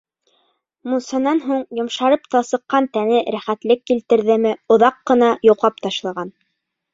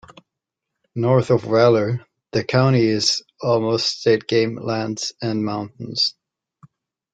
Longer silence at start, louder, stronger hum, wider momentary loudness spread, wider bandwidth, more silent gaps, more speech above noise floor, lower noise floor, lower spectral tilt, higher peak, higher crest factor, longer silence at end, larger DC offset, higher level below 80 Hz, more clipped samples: about the same, 0.85 s vs 0.95 s; about the same, -18 LUFS vs -20 LUFS; neither; about the same, 10 LU vs 10 LU; second, 7.8 kHz vs 9.2 kHz; neither; second, 57 dB vs 64 dB; second, -74 dBFS vs -83 dBFS; about the same, -5 dB/octave vs -5.5 dB/octave; about the same, -2 dBFS vs -2 dBFS; about the same, 16 dB vs 18 dB; second, 0.65 s vs 1 s; neither; second, -64 dBFS vs -58 dBFS; neither